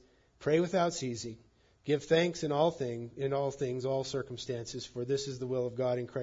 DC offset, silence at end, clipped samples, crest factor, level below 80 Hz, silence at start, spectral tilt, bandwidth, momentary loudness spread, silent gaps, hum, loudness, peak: under 0.1%; 0 s; under 0.1%; 20 dB; -66 dBFS; 0.4 s; -5.5 dB/octave; 7.8 kHz; 10 LU; none; none; -33 LUFS; -14 dBFS